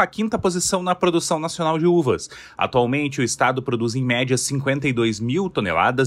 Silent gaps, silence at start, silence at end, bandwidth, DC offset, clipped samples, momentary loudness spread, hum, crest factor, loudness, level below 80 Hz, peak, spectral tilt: none; 0 s; 0 s; 14 kHz; under 0.1%; under 0.1%; 4 LU; none; 16 dB; -21 LUFS; -52 dBFS; -4 dBFS; -4.5 dB/octave